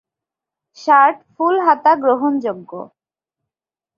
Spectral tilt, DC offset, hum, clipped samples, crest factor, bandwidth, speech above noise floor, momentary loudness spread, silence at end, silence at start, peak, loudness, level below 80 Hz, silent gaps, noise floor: -5.5 dB/octave; under 0.1%; none; under 0.1%; 16 dB; 7 kHz; 73 dB; 17 LU; 1.1 s; 0.8 s; -2 dBFS; -15 LUFS; -72 dBFS; none; -88 dBFS